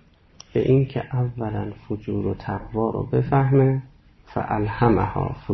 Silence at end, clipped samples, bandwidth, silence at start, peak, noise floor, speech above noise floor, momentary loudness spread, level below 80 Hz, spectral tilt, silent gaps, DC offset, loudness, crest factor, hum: 0 s; under 0.1%; 6.2 kHz; 0.55 s; -6 dBFS; -50 dBFS; 28 dB; 11 LU; -42 dBFS; -9.5 dB/octave; none; under 0.1%; -23 LUFS; 16 dB; none